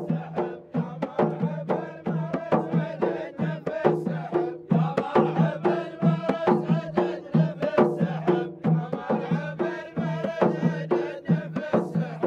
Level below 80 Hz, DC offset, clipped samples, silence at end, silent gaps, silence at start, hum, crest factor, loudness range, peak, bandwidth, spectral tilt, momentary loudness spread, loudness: -68 dBFS; under 0.1%; under 0.1%; 0 s; none; 0 s; none; 20 dB; 3 LU; -6 dBFS; 6.6 kHz; -9 dB/octave; 7 LU; -26 LUFS